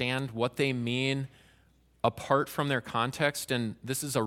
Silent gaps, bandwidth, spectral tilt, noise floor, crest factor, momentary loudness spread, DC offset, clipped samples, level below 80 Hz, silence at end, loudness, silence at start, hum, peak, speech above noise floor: none; 16.5 kHz; -4.5 dB/octave; -64 dBFS; 22 dB; 5 LU; under 0.1%; under 0.1%; -64 dBFS; 0 s; -30 LUFS; 0 s; none; -10 dBFS; 34 dB